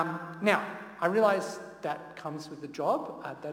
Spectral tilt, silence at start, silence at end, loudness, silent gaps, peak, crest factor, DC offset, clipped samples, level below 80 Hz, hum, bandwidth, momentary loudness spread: -5.5 dB/octave; 0 s; 0 s; -31 LUFS; none; -10 dBFS; 22 dB; under 0.1%; under 0.1%; -74 dBFS; none; 17 kHz; 14 LU